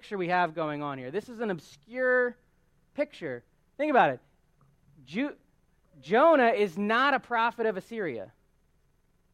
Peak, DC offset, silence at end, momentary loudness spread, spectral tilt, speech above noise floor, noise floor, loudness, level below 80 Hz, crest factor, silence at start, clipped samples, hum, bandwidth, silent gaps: -8 dBFS; under 0.1%; 1.05 s; 16 LU; -6 dB/octave; 40 dB; -68 dBFS; -27 LUFS; -70 dBFS; 20 dB; 0.05 s; under 0.1%; none; 13 kHz; none